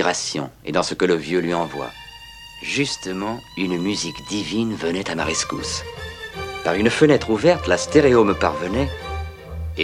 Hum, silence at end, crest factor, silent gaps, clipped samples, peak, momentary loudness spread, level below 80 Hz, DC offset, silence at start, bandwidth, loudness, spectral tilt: none; 0 s; 20 dB; none; under 0.1%; 0 dBFS; 16 LU; -40 dBFS; under 0.1%; 0 s; 14.5 kHz; -21 LUFS; -4.5 dB/octave